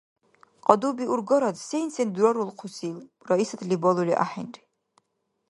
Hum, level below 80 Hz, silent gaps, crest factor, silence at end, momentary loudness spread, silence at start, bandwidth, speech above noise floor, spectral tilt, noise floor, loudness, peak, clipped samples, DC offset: none; -76 dBFS; none; 26 dB; 0.95 s; 13 LU; 0.65 s; 11.5 kHz; 51 dB; -6 dB/octave; -76 dBFS; -25 LUFS; 0 dBFS; under 0.1%; under 0.1%